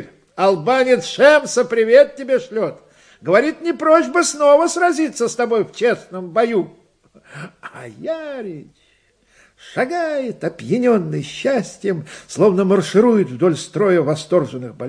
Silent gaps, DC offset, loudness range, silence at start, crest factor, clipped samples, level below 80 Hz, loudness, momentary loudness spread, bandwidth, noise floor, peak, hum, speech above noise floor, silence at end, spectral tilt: none; under 0.1%; 10 LU; 0 s; 18 dB; under 0.1%; -64 dBFS; -17 LUFS; 17 LU; 10.5 kHz; -58 dBFS; 0 dBFS; none; 42 dB; 0 s; -5 dB/octave